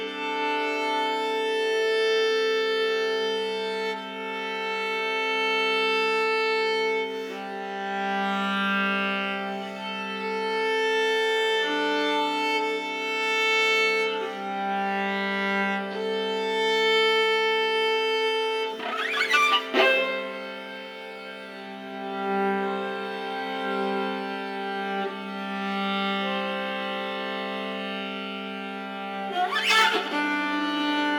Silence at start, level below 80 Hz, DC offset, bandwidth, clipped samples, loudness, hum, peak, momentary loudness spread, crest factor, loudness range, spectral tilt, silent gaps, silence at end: 0 s; -84 dBFS; under 0.1%; 19.5 kHz; under 0.1%; -25 LUFS; none; -8 dBFS; 12 LU; 20 dB; 6 LU; -3.5 dB/octave; none; 0 s